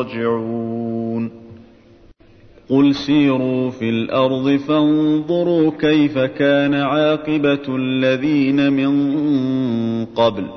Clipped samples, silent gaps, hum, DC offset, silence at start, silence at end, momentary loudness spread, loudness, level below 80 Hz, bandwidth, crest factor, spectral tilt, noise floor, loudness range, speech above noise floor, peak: under 0.1%; none; none; under 0.1%; 0 s; 0 s; 7 LU; -17 LUFS; -54 dBFS; 6.4 kHz; 14 dB; -7.5 dB/octave; -47 dBFS; 4 LU; 30 dB; -4 dBFS